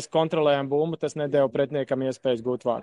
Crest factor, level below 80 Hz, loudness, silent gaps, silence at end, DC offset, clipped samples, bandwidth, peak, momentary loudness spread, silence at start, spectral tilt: 16 dB; -68 dBFS; -25 LUFS; none; 0 s; under 0.1%; under 0.1%; 11 kHz; -10 dBFS; 5 LU; 0 s; -6 dB/octave